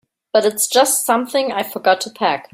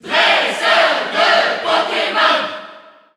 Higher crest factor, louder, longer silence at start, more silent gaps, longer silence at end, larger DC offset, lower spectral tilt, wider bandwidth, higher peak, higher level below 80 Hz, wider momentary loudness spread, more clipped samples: about the same, 16 dB vs 14 dB; second, -17 LUFS vs -14 LUFS; first, 0.35 s vs 0.05 s; neither; second, 0.1 s vs 0.35 s; neither; about the same, -1.5 dB/octave vs -1.5 dB/octave; first, 16.5 kHz vs 13 kHz; about the same, -2 dBFS vs -2 dBFS; about the same, -68 dBFS vs -66 dBFS; about the same, 6 LU vs 5 LU; neither